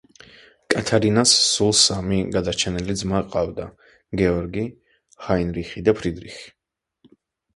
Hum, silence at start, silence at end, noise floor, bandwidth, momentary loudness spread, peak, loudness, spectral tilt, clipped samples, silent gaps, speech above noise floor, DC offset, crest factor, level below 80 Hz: none; 0.7 s; 1.05 s; -61 dBFS; 11.5 kHz; 18 LU; -2 dBFS; -20 LUFS; -3.5 dB/octave; under 0.1%; none; 40 dB; under 0.1%; 22 dB; -42 dBFS